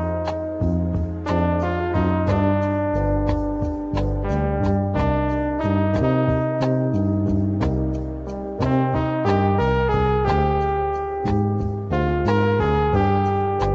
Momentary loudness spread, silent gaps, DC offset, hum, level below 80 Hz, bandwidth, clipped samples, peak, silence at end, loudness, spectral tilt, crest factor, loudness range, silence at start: 6 LU; none; under 0.1%; none; -32 dBFS; 7.2 kHz; under 0.1%; -6 dBFS; 0 s; -21 LUFS; -9 dB/octave; 14 dB; 1 LU; 0 s